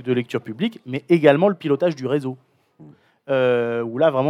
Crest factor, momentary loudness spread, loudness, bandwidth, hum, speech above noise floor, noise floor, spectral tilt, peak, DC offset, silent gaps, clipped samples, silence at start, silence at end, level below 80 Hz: 20 dB; 12 LU; -20 LUFS; 11.5 kHz; none; 29 dB; -48 dBFS; -7.5 dB/octave; 0 dBFS; under 0.1%; none; under 0.1%; 0 s; 0 s; -78 dBFS